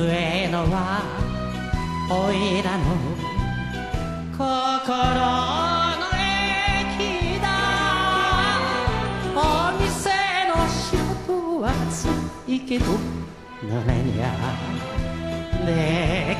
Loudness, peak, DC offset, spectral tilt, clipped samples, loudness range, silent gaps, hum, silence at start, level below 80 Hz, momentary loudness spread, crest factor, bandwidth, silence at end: -23 LUFS; -6 dBFS; under 0.1%; -5 dB/octave; under 0.1%; 4 LU; none; none; 0 s; -34 dBFS; 8 LU; 18 dB; 13 kHz; 0 s